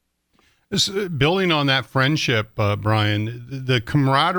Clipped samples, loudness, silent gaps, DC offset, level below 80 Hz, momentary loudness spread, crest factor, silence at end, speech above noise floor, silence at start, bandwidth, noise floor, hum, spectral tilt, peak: under 0.1%; -20 LUFS; none; under 0.1%; -50 dBFS; 7 LU; 16 dB; 0 s; 43 dB; 0.7 s; 19.5 kHz; -63 dBFS; none; -5 dB/octave; -4 dBFS